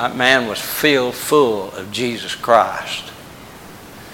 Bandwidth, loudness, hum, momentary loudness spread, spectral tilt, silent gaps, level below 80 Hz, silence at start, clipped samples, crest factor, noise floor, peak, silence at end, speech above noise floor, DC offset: 17 kHz; -17 LUFS; none; 23 LU; -3 dB/octave; none; -54 dBFS; 0 s; under 0.1%; 18 dB; -38 dBFS; 0 dBFS; 0 s; 20 dB; under 0.1%